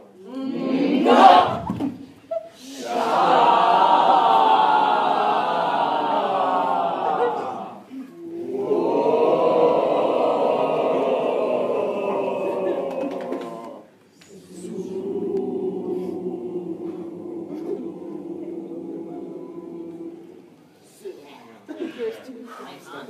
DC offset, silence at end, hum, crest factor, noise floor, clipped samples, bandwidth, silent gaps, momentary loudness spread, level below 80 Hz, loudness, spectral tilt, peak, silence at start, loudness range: under 0.1%; 0 s; none; 22 dB; -51 dBFS; under 0.1%; 13.5 kHz; none; 21 LU; -66 dBFS; -21 LUFS; -5.5 dB/octave; 0 dBFS; 0 s; 18 LU